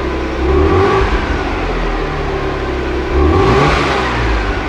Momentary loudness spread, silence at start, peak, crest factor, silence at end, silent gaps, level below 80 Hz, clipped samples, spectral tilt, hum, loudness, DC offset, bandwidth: 8 LU; 0 s; 0 dBFS; 12 dB; 0 s; none; -20 dBFS; under 0.1%; -6.5 dB/octave; none; -14 LUFS; under 0.1%; 10 kHz